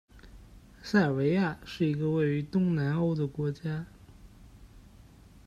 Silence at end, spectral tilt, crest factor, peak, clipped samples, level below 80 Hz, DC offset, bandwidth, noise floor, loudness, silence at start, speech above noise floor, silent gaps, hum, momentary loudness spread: 0.65 s; -8 dB/octave; 18 dB; -12 dBFS; under 0.1%; -56 dBFS; under 0.1%; 11.5 kHz; -54 dBFS; -29 LUFS; 0.15 s; 26 dB; none; none; 10 LU